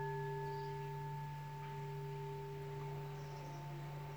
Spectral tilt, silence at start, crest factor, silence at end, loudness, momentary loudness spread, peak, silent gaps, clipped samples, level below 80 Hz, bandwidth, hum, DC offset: -7 dB/octave; 0 s; 12 dB; 0 s; -46 LUFS; 5 LU; -34 dBFS; none; under 0.1%; -70 dBFS; over 20 kHz; none; under 0.1%